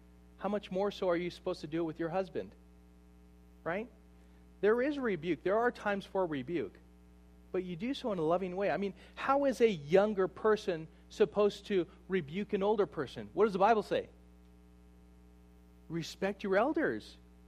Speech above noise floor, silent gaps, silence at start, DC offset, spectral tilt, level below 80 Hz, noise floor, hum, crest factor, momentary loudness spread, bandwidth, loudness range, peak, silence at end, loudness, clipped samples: 26 dB; none; 0.4 s; under 0.1%; -6.5 dB/octave; -60 dBFS; -59 dBFS; 60 Hz at -60 dBFS; 20 dB; 12 LU; 13 kHz; 6 LU; -14 dBFS; 0.3 s; -34 LUFS; under 0.1%